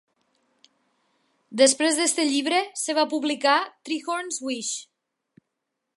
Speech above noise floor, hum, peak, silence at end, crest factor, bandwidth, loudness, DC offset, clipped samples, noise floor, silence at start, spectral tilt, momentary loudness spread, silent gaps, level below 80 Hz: 58 dB; none; -4 dBFS; 1.1 s; 22 dB; 11.5 kHz; -23 LUFS; under 0.1%; under 0.1%; -81 dBFS; 1.5 s; -0.5 dB/octave; 11 LU; none; -84 dBFS